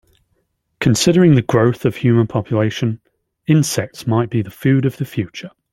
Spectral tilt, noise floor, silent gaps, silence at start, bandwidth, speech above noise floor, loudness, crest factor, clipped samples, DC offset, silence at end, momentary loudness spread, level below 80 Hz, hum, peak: -6 dB/octave; -66 dBFS; none; 0.8 s; 16 kHz; 51 dB; -16 LUFS; 16 dB; under 0.1%; under 0.1%; 0.25 s; 12 LU; -50 dBFS; none; -2 dBFS